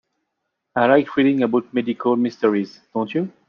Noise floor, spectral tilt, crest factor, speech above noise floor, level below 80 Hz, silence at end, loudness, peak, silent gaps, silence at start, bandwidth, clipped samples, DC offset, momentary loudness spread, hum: -77 dBFS; -7.5 dB/octave; 18 dB; 58 dB; -66 dBFS; 0.2 s; -20 LUFS; -2 dBFS; none; 0.75 s; 6.6 kHz; under 0.1%; under 0.1%; 10 LU; none